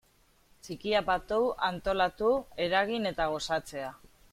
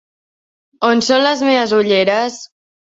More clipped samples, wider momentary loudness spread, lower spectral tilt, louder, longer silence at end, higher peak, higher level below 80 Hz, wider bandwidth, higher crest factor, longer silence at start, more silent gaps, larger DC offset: neither; first, 11 LU vs 7 LU; about the same, -4 dB/octave vs -3.5 dB/octave; second, -30 LUFS vs -14 LUFS; second, 0.25 s vs 0.45 s; second, -12 dBFS vs -2 dBFS; first, -54 dBFS vs -60 dBFS; first, 16 kHz vs 8 kHz; about the same, 18 dB vs 14 dB; second, 0.65 s vs 0.8 s; neither; neither